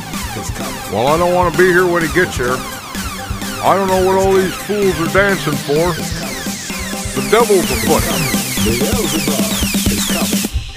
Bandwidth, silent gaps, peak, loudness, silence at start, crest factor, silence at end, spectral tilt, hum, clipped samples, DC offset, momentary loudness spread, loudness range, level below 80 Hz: 16 kHz; none; 0 dBFS; -15 LUFS; 0 s; 16 dB; 0 s; -4 dB/octave; none; under 0.1%; under 0.1%; 11 LU; 1 LU; -30 dBFS